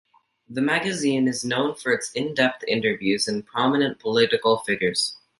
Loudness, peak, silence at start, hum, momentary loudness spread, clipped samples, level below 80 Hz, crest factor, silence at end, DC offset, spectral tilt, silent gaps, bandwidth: -23 LUFS; -4 dBFS; 0.5 s; none; 4 LU; under 0.1%; -64 dBFS; 20 dB; 0.25 s; under 0.1%; -4 dB/octave; none; 11.5 kHz